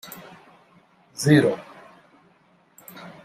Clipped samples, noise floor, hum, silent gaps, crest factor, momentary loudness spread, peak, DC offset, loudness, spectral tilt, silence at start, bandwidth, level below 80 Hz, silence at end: under 0.1%; -60 dBFS; none; none; 24 dB; 26 LU; -2 dBFS; under 0.1%; -20 LUFS; -6 dB/octave; 0.05 s; 15.5 kHz; -64 dBFS; 0.15 s